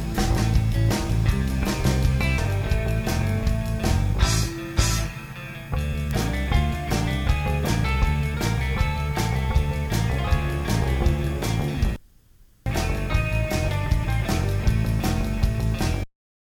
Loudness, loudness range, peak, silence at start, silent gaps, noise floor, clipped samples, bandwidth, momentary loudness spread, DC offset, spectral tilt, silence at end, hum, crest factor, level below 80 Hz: -24 LUFS; 2 LU; -6 dBFS; 0 s; none; -53 dBFS; under 0.1%; 19 kHz; 5 LU; under 0.1%; -5.5 dB/octave; 0.45 s; none; 16 dB; -26 dBFS